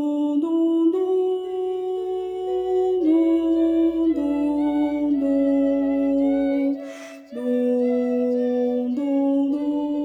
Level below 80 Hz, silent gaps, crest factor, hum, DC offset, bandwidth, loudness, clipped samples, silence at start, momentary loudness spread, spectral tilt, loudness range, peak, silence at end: -56 dBFS; none; 10 dB; none; under 0.1%; 7.6 kHz; -22 LUFS; under 0.1%; 0 s; 7 LU; -6.5 dB/octave; 2 LU; -10 dBFS; 0 s